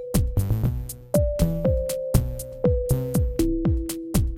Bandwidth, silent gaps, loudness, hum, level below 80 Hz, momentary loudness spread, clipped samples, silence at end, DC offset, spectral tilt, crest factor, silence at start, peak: 17 kHz; none; -25 LUFS; none; -28 dBFS; 4 LU; under 0.1%; 0 s; under 0.1%; -7 dB/octave; 18 dB; 0 s; -6 dBFS